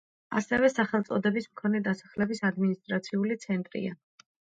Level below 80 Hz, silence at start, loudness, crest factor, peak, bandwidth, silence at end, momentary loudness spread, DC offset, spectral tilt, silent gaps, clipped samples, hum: -66 dBFS; 0.3 s; -29 LUFS; 18 dB; -12 dBFS; 7.8 kHz; 0.45 s; 8 LU; under 0.1%; -6.5 dB/octave; none; under 0.1%; none